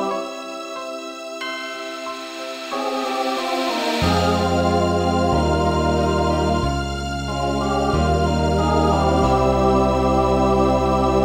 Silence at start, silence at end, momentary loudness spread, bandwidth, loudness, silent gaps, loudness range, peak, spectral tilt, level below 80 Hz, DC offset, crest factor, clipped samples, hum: 0 s; 0 s; 12 LU; 16 kHz; -20 LUFS; none; 7 LU; -4 dBFS; -6 dB/octave; -30 dBFS; under 0.1%; 14 dB; under 0.1%; none